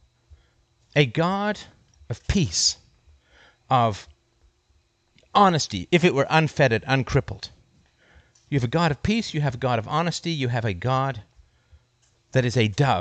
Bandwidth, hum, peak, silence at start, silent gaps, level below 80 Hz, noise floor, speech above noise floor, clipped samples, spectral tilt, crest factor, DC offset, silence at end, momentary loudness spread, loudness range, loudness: 9 kHz; none; -4 dBFS; 0.95 s; none; -46 dBFS; -65 dBFS; 43 dB; under 0.1%; -5 dB/octave; 22 dB; under 0.1%; 0 s; 12 LU; 4 LU; -23 LUFS